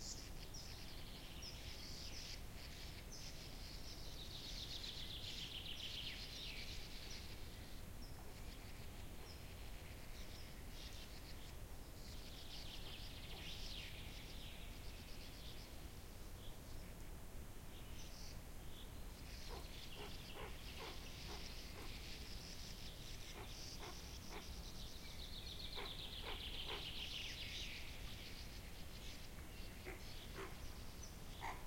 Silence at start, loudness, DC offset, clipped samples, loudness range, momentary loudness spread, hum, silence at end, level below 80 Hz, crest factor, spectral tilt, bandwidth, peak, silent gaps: 0 s; -52 LUFS; under 0.1%; under 0.1%; 7 LU; 8 LU; none; 0 s; -56 dBFS; 16 dB; -3 dB/octave; 16.5 kHz; -34 dBFS; none